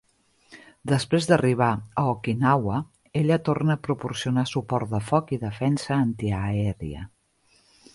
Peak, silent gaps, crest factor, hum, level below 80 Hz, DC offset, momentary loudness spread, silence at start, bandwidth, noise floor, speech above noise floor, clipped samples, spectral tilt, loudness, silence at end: -4 dBFS; none; 20 dB; none; -50 dBFS; under 0.1%; 10 LU; 0.5 s; 11.5 kHz; -63 dBFS; 40 dB; under 0.1%; -6.5 dB/octave; -25 LUFS; 0.9 s